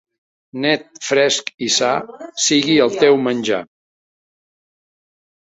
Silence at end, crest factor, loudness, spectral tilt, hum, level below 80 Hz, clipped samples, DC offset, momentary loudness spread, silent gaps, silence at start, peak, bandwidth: 1.85 s; 18 dB; -16 LUFS; -2.5 dB/octave; none; -62 dBFS; under 0.1%; under 0.1%; 9 LU; 1.54-1.58 s; 0.55 s; -2 dBFS; 8 kHz